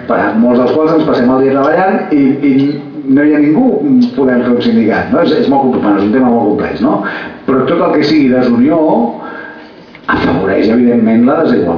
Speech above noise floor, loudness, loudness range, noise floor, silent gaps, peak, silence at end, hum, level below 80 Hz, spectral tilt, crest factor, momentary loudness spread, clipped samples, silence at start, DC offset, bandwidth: 24 dB; -10 LUFS; 2 LU; -33 dBFS; none; 0 dBFS; 0 s; none; -44 dBFS; -8.5 dB/octave; 8 dB; 7 LU; under 0.1%; 0 s; under 0.1%; 5.4 kHz